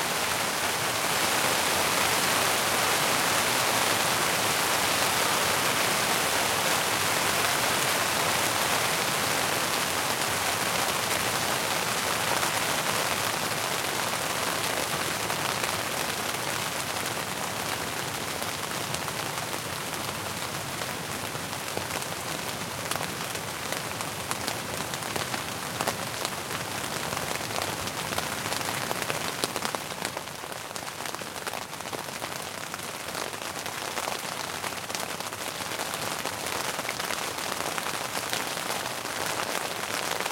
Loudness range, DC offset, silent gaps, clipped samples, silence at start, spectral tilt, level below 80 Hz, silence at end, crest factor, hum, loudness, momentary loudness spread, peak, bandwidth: 9 LU; under 0.1%; none; under 0.1%; 0 s; -1.5 dB/octave; -60 dBFS; 0 s; 28 dB; none; -27 LUFS; 9 LU; -2 dBFS; 17 kHz